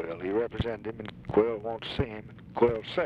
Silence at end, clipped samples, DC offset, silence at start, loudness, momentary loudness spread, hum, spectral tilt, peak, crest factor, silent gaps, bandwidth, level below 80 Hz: 0 s; under 0.1%; under 0.1%; 0 s; -30 LUFS; 13 LU; none; -8 dB/octave; -12 dBFS; 18 dB; none; 7.2 kHz; -48 dBFS